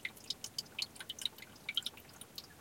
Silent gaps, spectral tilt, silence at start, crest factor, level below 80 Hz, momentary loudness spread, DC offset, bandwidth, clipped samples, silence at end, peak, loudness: none; 0 dB/octave; 0 s; 26 dB; -74 dBFS; 11 LU; under 0.1%; 17 kHz; under 0.1%; 0 s; -20 dBFS; -42 LUFS